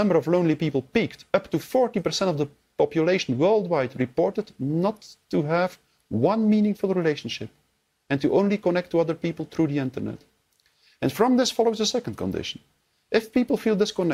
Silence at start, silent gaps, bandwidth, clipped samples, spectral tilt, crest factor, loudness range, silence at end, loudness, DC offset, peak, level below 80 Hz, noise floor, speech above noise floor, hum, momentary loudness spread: 0 s; none; 16 kHz; under 0.1%; -6 dB/octave; 18 dB; 2 LU; 0 s; -24 LUFS; under 0.1%; -6 dBFS; -60 dBFS; -70 dBFS; 47 dB; none; 9 LU